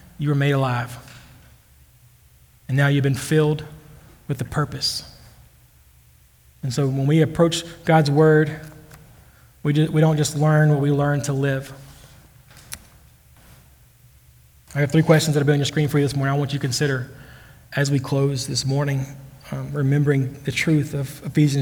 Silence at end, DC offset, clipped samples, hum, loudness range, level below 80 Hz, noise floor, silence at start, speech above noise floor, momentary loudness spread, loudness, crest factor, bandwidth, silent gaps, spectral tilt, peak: 0 s; under 0.1%; under 0.1%; none; 7 LU; -52 dBFS; -53 dBFS; 0.2 s; 34 dB; 16 LU; -21 LUFS; 20 dB; over 20 kHz; none; -6 dB/octave; -2 dBFS